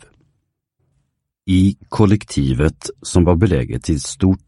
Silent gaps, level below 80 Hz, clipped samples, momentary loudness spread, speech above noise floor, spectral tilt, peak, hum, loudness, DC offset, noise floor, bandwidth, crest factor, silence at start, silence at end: none; -32 dBFS; under 0.1%; 7 LU; 54 dB; -6.5 dB/octave; 0 dBFS; none; -17 LUFS; under 0.1%; -70 dBFS; 11.5 kHz; 16 dB; 1.45 s; 0.1 s